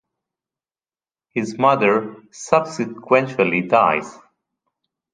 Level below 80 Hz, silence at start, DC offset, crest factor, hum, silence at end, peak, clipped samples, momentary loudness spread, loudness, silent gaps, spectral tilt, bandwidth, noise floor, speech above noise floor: -64 dBFS; 1.35 s; under 0.1%; 20 dB; none; 1 s; 0 dBFS; under 0.1%; 12 LU; -19 LUFS; none; -5.5 dB/octave; 9.8 kHz; under -90 dBFS; over 71 dB